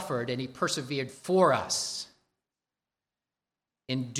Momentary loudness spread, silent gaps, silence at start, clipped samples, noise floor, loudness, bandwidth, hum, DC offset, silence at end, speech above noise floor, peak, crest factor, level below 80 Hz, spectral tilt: 11 LU; none; 0 s; under 0.1%; under -90 dBFS; -29 LUFS; 15 kHz; none; under 0.1%; 0 s; over 61 dB; -10 dBFS; 22 dB; -72 dBFS; -4 dB/octave